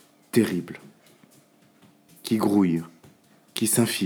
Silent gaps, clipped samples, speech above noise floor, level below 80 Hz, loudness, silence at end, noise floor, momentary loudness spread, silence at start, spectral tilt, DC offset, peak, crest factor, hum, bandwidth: none; under 0.1%; 35 dB; -70 dBFS; -24 LUFS; 0 s; -58 dBFS; 19 LU; 0.35 s; -4.5 dB/octave; under 0.1%; -6 dBFS; 20 dB; none; over 20 kHz